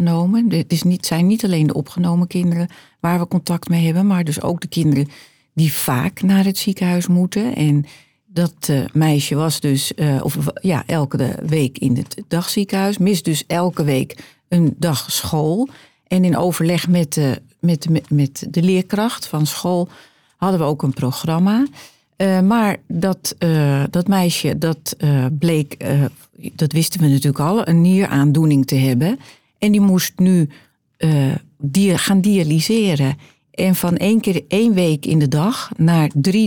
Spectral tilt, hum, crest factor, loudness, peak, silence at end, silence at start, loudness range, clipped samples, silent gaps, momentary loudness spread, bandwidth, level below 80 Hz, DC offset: -6 dB/octave; none; 12 dB; -17 LUFS; -4 dBFS; 0 s; 0 s; 3 LU; under 0.1%; none; 6 LU; over 20 kHz; -56 dBFS; under 0.1%